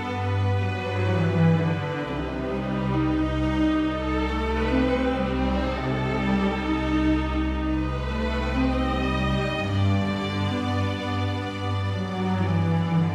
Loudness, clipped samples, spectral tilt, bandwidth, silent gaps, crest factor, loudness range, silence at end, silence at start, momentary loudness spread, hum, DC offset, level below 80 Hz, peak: -25 LUFS; under 0.1%; -7.5 dB/octave; 9.4 kHz; none; 14 dB; 1 LU; 0 s; 0 s; 5 LU; none; under 0.1%; -34 dBFS; -10 dBFS